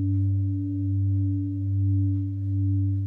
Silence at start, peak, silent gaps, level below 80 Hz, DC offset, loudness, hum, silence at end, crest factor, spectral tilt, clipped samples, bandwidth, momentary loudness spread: 0 s; -16 dBFS; none; -60 dBFS; under 0.1%; -26 LUFS; none; 0 s; 8 dB; -13 dB/octave; under 0.1%; 0.6 kHz; 4 LU